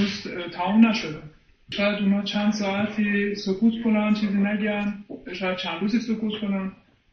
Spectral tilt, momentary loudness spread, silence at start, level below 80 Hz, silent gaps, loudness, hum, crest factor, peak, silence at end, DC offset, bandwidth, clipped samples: -6 dB/octave; 11 LU; 0 s; -58 dBFS; none; -24 LUFS; none; 18 dB; -6 dBFS; 0.4 s; under 0.1%; 6.8 kHz; under 0.1%